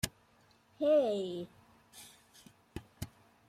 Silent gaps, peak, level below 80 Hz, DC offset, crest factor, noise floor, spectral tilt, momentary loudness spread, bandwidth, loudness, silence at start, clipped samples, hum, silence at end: none; -18 dBFS; -62 dBFS; under 0.1%; 20 dB; -67 dBFS; -5 dB/octave; 25 LU; 15.5 kHz; -33 LUFS; 0.05 s; under 0.1%; none; 0.45 s